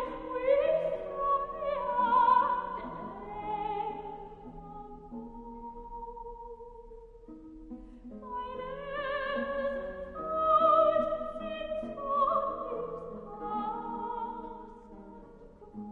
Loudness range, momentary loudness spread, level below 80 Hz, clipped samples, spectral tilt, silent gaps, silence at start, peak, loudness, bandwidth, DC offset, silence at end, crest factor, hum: 16 LU; 23 LU; -54 dBFS; under 0.1%; -7.5 dB/octave; none; 0 s; -14 dBFS; -31 LUFS; 4.6 kHz; under 0.1%; 0 s; 20 dB; none